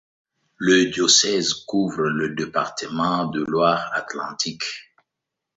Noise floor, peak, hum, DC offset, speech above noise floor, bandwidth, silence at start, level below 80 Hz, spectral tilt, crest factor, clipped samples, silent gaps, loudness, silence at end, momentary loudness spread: -83 dBFS; -2 dBFS; none; under 0.1%; 62 dB; 8 kHz; 0.6 s; -60 dBFS; -2.5 dB/octave; 22 dB; under 0.1%; none; -21 LUFS; 0.75 s; 12 LU